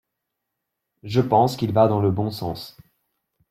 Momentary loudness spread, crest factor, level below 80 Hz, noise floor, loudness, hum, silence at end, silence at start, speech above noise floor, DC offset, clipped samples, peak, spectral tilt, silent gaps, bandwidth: 13 LU; 18 dB; -56 dBFS; -81 dBFS; -21 LUFS; none; 0.8 s; 1.05 s; 60 dB; under 0.1%; under 0.1%; -4 dBFS; -7.5 dB/octave; none; 15.5 kHz